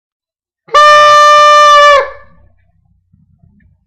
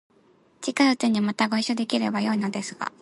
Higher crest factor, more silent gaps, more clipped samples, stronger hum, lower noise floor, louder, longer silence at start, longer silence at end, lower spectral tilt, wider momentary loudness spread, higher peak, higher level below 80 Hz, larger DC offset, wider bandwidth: second, 8 dB vs 18 dB; neither; neither; neither; second, -54 dBFS vs -60 dBFS; first, -4 LUFS vs -24 LUFS; first, 0.75 s vs 0.6 s; first, 1.75 s vs 0.15 s; second, 0.5 dB/octave vs -4.5 dB/octave; about the same, 8 LU vs 10 LU; first, 0 dBFS vs -8 dBFS; first, -48 dBFS vs -72 dBFS; neither; first, 15.5 kHz vs 11.5 kHz